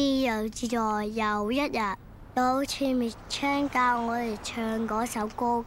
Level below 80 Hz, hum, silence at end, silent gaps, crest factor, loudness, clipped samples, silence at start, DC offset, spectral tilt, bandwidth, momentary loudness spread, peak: -50 dBFS; none; 0 s; none; 14 dB; -28 LUFS; under 0.1%; 0 s; under 0.1%; -4 dB/octave; 16.5 kHz; 6 LU; -14 dBFS